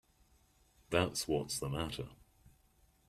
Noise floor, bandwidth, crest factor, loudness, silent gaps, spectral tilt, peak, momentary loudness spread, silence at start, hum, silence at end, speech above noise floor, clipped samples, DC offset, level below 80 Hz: -70 dBFS; 15 kHz; 26 dB; -37 LUFS; none; -4 dB/octave; -14 dBFS; 10 LU; 0.9 s; none; 0.95 s; 34 dB; under 0.1%; under 0.1%; -60 dBFS